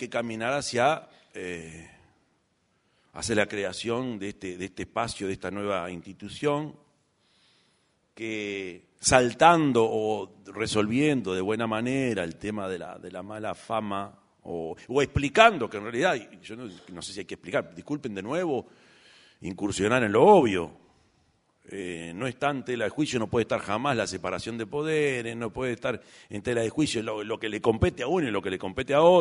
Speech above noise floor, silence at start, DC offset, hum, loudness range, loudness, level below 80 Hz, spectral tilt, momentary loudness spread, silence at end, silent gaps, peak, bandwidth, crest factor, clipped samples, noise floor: 44 dB; 0 s; under 0.1%; none; 8 LU; -27 LUFS; -54 dBFS; -4.5 dB/octave; 19 LU; 0 s; none; 0 dBFS; 11 kHz; 26 dB; under 0.1%; -71 dBFS